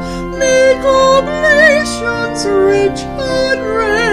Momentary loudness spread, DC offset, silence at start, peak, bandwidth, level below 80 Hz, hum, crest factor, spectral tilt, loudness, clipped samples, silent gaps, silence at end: 9 LU; under 0.1%; 0 s; 0 dBFS; 13.5 kHz; -32 dBFS; none; 12 dB; -3.5 dB/octave; -12 LUFS; under 0.1%; none; 0 s